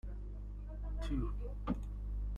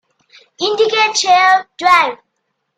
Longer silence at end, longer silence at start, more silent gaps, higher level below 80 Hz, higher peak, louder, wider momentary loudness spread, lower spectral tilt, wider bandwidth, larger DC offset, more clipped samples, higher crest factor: second, 0 s vs 0.6 s; second, 0.05 s vs 0.6 s; neither; first, -40 dBFS vs -60 dBFS; second, -22 dBFS vs 0 dBFS; second, -43 LUFS vs -12 LUFS; about the same, 8 LU vs 9 LU; first, -8 dB/octave vs 0 dB/octave; second, 7 kHz vs 12.5 kHz; neither; neither; about the same, 18 dB vs 14 dB